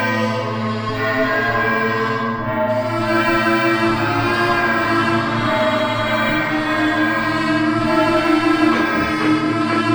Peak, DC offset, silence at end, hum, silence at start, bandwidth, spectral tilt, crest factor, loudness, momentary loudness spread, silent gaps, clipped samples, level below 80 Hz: -4 dBFS; under 0.1%; 0 s; none; 0 s; over 20 kHz; -6 dB/octave; 14 dB; -17 LUFS; 4 LU; none; under 0.1%; -44 dBFS